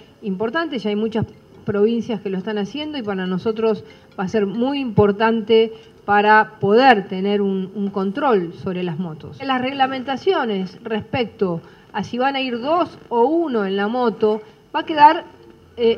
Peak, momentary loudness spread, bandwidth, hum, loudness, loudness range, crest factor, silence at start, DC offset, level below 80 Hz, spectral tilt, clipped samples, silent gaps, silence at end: 0 dBFS; 13 LU; 6.8 kHz; none; -19 LUFS; 6 LU; 20 dB; 0.2 s; under 0.1%; -56 dBFS; -7 dB/octave; under 0.1%; none; 0 s